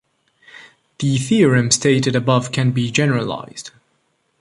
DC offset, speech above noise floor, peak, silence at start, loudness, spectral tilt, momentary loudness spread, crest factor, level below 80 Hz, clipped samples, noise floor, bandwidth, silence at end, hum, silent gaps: under 0.1%; 49 dB; -2 dBFS; 0.55 s; -17 LUFS; -5 dB/octave; 15 LU; 16 dB; -54 dBFS; under 0.1%; -65 dBFS; 11.5 kHz; 0.7 s; none; none